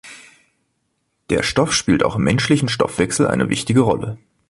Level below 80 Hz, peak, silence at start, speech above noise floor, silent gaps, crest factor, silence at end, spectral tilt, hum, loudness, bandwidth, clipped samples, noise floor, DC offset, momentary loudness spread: -44 dBFS; -2 dBFS; 0.05 s; 53 dB; none; 16 dB; 0.35 s; -5 dB/octave; none; -18 LUFS; 11.5 kHz; under 0.1%; -70 dBFS; under 0.1%; 6 LU